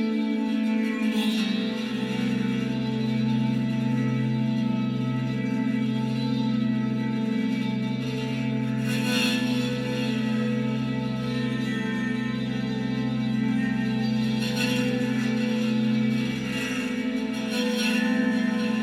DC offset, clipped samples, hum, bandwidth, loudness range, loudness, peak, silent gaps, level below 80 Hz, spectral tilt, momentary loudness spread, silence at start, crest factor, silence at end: under 0.1%; under 0.1%; none; 14.5 kHz; 2 LU; -26 LUFS; -12 dBFS; none; -58 dBFS; -6 dB/octave; 4 LU; 0 s; 12 dB; 0 s